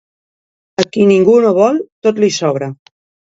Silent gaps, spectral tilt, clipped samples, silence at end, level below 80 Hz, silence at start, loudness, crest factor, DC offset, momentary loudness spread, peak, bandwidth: 1.92-2.02 s; -5.5 dB/octave; under 0.1%; 0.6 s; -58 dBFS; 0.8 s; -12 LUFS; 14 dB; under 0.1%; 12 LU; 0 dBFS; 8 kHz